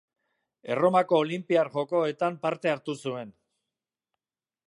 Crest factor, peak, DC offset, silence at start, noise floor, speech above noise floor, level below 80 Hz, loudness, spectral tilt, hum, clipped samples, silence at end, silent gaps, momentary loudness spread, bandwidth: 20 dB; -8 dBFS; under 0.1%; 0.65 s; under -90 dBFS; over 64 dB; -80 dBFS; -27 LUFS; -6.5 dB/octave; none; under 0.1%; 1.4 s; none; 13 LU; 11.5 kHz